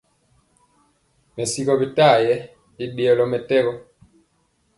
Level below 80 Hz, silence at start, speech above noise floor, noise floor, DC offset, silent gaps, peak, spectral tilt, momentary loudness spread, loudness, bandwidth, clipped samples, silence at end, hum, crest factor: -62 dBFS; 1.35 s; 47 dB; -65 dBFS; under 0.1%; none; -4 dBFS; -4.5 dB/octave; 17 LU; -19 LUFS; 11.5 kHz; under 0.1%; 1 s; none; 18 dB